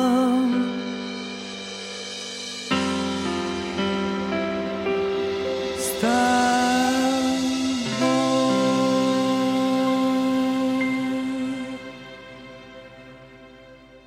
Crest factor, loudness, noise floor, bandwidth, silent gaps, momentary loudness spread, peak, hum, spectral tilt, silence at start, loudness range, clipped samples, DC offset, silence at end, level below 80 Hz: 16 dB; -23 LUFS; -47 dBFS; 16 kHz; none; 13 LU; -8 dBFS; none; -4 dB/octave; 0 s; 6 LU; under 0.1%; under 0.1%; 0.05 s; -58 dBFS